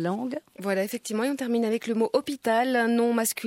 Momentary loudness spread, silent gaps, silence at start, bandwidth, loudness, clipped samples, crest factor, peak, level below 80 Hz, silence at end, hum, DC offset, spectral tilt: 7 LU; none; 0 s; 16.5 kHz; -26 LUFS; under 0.1%; 16 dB; -10 dBFS; -76 dBFS; 0 s; none; under 0.1%; -4 dB/octave